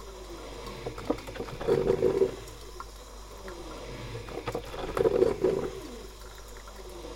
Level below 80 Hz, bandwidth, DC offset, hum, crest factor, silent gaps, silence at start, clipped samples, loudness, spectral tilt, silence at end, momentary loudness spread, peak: -46 dBFS; 17 kHz; under 0.1%; none; 22 dB; none; 0 s; under 0.1%; -31 LUFS; -6 dB/octave; 0 s; 19 LU; -10 dBFS